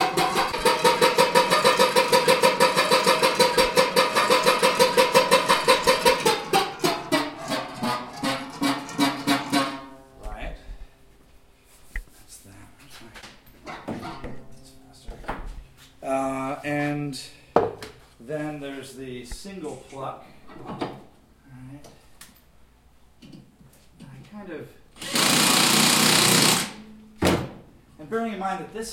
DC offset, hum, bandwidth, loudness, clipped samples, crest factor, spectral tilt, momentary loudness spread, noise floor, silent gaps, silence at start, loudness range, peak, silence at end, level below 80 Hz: under 0.1%; none; 17 kHz; -21 LUFS; under 0.1%; 24 dB; -2.5 dB/octave; 21 LU; -55 dBFS; none; 0 s; 22 LU; 0 dBFS; 0 s; -48 dBFS